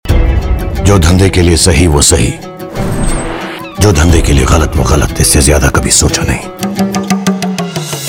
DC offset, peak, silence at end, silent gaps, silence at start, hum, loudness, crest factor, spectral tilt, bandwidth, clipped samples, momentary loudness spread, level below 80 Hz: under 0.1%; 0 dBFS; 0 s; none; 0.05 s; none; -10 LUFS; 10 dB; -4.5 dB/octave; 20 kHz; 1%; 10 LU; -16 dBFS